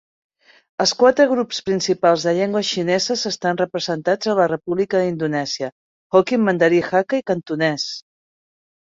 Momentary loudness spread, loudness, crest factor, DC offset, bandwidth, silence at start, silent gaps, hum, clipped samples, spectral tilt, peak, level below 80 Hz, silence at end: 8 LU; -19 LUFS; 18 dB; under 0.1%; 7.8 kHz; 0.8 s; 5.72-6.10 s; none; under 0.1%; -4.5 dB/octave; -2 dBFS; -62 dBFS; 0.9 s